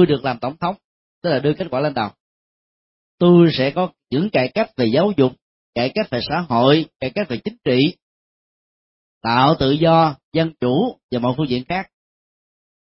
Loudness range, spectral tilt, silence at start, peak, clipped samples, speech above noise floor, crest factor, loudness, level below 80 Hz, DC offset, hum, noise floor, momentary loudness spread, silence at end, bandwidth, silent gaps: 3 LU; -11 dB/octave; 0 s; -2 dBFS; under 0.1%; over 72 dB; 18 dB; -19 LUFS; -50 dBFS; under 0.1%; none; under -90 dBFS; 11 LU; 1.1 s; 5.8 kHz; 0.84-1.22 s, 2.20-3.18 s, 5.42-5.73 s, 8.02-9.21 s, 10.24-10.32 s, 11.03-11.09 s